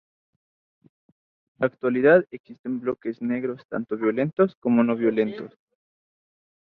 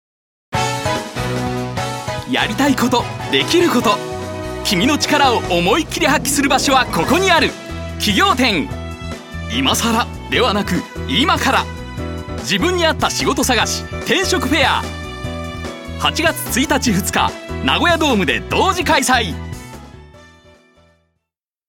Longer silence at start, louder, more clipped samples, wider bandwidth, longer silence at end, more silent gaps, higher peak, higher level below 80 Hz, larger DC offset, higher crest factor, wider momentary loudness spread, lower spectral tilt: first, 1.6 s vs 0.5 s; second, -23 LUFS vs -16 LUFS; neither; second, 4.6 kHz vs 17.5 kHz; second, 1.2 s vs 1.45 s; first, 2.40-2.44 s, 2.59-2.64 s, 3.65-3.69 s, 4.57-4.62 s vs none; second, -4 dBFS vs 0 dBFS; second, -68 dBFS vs -34 dBFS; neither; about the same, 20 dB vs 18 dB; about the same, 14 LU vs 13 LU; first, -10.5 dB/octave vs -3.5 dB/octave